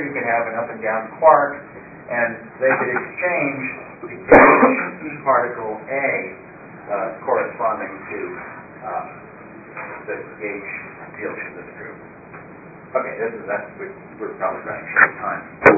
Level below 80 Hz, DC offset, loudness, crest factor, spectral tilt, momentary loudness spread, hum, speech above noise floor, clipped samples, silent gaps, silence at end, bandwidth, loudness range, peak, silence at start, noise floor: -52 dBFS; under 0.1%; -19 LUFS; 20 dB; -9 dB/octave; 22 LU; none; 20 dB; under 0.1%; none; 0 s; 8 kHz; 14 LU; 0 dBFS; 0 s; -40 dBFS